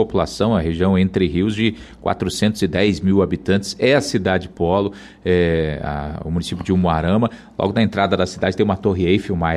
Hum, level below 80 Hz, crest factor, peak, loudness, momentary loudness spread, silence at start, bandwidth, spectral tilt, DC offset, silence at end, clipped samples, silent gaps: none; -38 dBFS; 14 dB; -4 dBFS; -19 LUFS; 7 LU; 0 s; 13 kHz; -6.5 dB/octave; under 0.1%; 0 s; under 0.1%; none